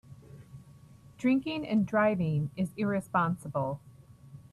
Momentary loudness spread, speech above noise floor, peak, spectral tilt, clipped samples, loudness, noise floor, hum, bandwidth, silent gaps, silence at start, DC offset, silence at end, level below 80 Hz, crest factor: 16 LU; 25 dB; -14 dBFS; -7.5 dB/octave; under 0.1%; -30 LUFS; -54 dBFS; none; 13 kHz; none; 0.1 s; under 0.1%; 0.1 s; -64 dBFS; 18 dB